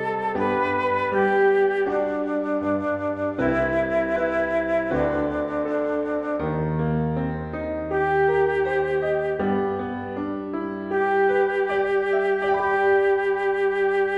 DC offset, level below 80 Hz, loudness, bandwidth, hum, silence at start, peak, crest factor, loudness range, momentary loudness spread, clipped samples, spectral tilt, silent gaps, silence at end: under 0.1%; -46 dBFS; -23 LUFS; 5.6 kHz; none; 0 s; -10 dBFS; 14 dB; 3 LU; 7 LU; under 0.1%; -8 dB/octave; none; 0 s